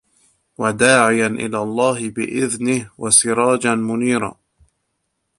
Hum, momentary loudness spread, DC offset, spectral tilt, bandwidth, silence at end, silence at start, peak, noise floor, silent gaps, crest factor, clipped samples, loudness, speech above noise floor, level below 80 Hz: none; 10 LU; under 0.1%; -3.5 dB/octave; 11.5 kHz; 1.05 s; 0.6 s; 0 dBFS; -72 dBFS; none; 18 dB; under 0.1%; -17 LUFS; 55 dB; -56 dBFS